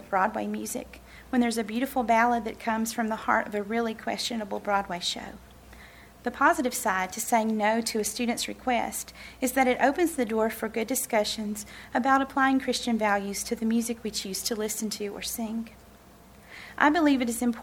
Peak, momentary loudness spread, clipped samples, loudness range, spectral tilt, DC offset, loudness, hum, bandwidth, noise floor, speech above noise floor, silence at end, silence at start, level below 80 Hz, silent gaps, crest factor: -4 dBFS; 11 LU; under 0.1%; 3 LU; -3 dB/octave; under 0.1%; -27 LUFS; none; 19 kHz; -52 dBFS; 25 dB; 0 s; 0 s; -56 dBFS; none; 24 dB